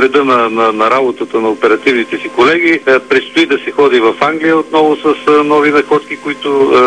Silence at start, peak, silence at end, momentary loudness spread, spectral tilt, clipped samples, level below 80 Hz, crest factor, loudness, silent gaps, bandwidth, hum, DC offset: 0 s; 0 dBFS; 0 s; 6 LU; -5 dB/octave; under 0.1%; -54 dBFS; 10 dB; -10 LUFS; none; 10 kHz; none; 0.2%